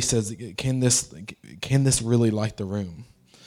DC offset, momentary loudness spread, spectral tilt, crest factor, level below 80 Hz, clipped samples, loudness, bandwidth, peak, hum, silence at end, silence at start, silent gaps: under 0.1%; 16 LU; -4.5 dB/octave; 18 dB; -48 dBFS; under 0.1%; -24 LUFS; 15.5 kHz; -8 dBFS; none; 0.45 s; 0 s; none